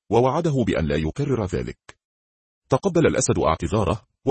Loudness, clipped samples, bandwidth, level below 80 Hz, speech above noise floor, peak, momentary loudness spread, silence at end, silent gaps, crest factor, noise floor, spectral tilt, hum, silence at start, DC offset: -22 LUFS; under 0.1%; 8.8 kHz; -42 dBFS; over 69 dB; -4 dBFS; 7 LU; 0 s; 2.05-2.62 s; 18 dB; under -90 dBFS; -6 dB/octave; none; 0.1 s; under 0.1%